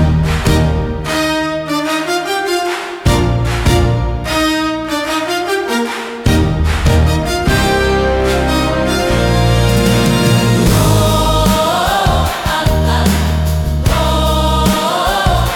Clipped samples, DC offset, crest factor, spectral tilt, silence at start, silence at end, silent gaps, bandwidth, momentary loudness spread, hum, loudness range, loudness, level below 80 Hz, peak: under 0.1%; under 0.1%; 12 dB; -5 dB/octave; 0 s; 0 s; none; 18 kHz; 5 LU; none; 3 LU; -13 LUFS; -20 dBFS; 0 dBFS